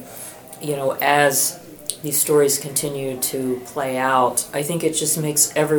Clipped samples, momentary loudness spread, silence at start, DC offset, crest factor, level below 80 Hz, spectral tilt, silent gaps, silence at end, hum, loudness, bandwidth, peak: under 0.1%; 13 LU; 0 s; under 0.1%; 20 dB; -60 dBFS; -3 dB/octave; none; 0 s; none; -19 LUFS; over 20 kHz; 0 dBFS